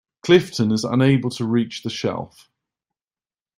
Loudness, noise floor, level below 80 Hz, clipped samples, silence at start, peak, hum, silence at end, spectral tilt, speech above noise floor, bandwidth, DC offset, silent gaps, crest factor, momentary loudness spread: -20 LUFS; under -90 dBFS; -58 dBFS; under 0.1%; 0.25 s; -2 dBFS; none; 1.3 s; -6 dB/octave; over 71 dB; 15 kHz; under 0.1%; none; 20 dB; 10 LU